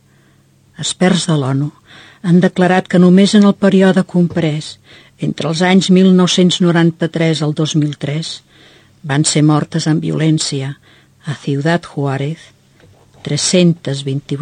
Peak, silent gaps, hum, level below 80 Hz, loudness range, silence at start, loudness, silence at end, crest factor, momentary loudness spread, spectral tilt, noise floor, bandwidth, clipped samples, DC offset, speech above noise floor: 0 dBFS; none; none; -56 dBFS; 6 LU; 0.8 s; -13 LUFS; 0 s; 14 dB; 14 LU; -5.5 dB/octave; -50 dBFS; 9.8 kHz; under 0.1%; under 0.1%; 37 dB